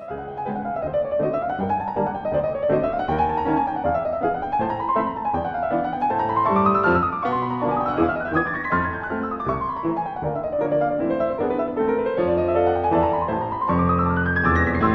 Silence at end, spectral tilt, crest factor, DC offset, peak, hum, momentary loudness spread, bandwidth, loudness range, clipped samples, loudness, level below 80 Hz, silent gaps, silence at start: 0 s; -9.5 dB/octave; 16 dB; under 0.1%; -6 dBFS; none; 6 LU; 6.2 kHz; 3 LU; under 0.1%; -22 LUFS; -42 dBFS; none; 0 s